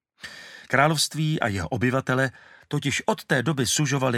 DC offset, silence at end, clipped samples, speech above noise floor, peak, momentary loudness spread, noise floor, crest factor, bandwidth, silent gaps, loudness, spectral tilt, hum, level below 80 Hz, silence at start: under 0.1%; 0 s; under 0.1%; 19 dB; -4 dBFS; 14 LU; -43 dBFS; 22 dB; 16 kHz; none; -24 LUFS; -4 dB/octave; none; -56 dBFS; 0.25 s